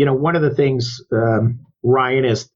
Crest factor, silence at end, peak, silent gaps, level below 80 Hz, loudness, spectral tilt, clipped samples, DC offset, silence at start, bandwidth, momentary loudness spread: 12 dB; 0.1 s; -4 dBFS; none; -52 dBFS; -18 LUFS; -7 dB/octave; under 0.1%; under 0.1%; 0 s; 7.6 kHz; 6 LU